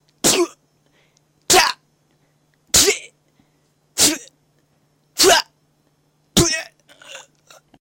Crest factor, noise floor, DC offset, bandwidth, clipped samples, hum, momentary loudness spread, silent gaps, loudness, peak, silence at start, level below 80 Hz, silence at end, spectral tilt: 20 dB; -62 dBFS; under 0.1%; 17 kHz; under 0.1%; none; 25 LU; none; -16 LUFS; -2 dBFS; 0.25 s; -46 dBFS; 0.6 s; -1.5 dB/octave